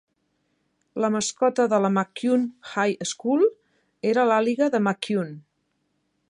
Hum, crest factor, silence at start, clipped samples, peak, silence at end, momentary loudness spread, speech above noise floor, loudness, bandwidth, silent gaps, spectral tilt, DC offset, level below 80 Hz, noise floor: none; 18 dB; 0.95 s; under 0.1%; -8 dBFS; 0.9 s; 7 LU; 50 dB; -23 LUFS; 11 kHz; none; -5 dB/octave; under 0.1%; -74 dBFS; -73 dBFS